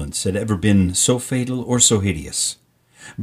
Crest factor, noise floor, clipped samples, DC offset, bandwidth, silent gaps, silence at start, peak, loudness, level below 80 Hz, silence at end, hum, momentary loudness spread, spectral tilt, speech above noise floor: 18 dB; -45 dBFS; under 0.1%; under 0.1%; 15.5 kHz; none; 0 s; 0 dBFS; -18 LUFS; -42 dBFS; 0 s; none; 9 LU; -4 dB/octave; 27 dB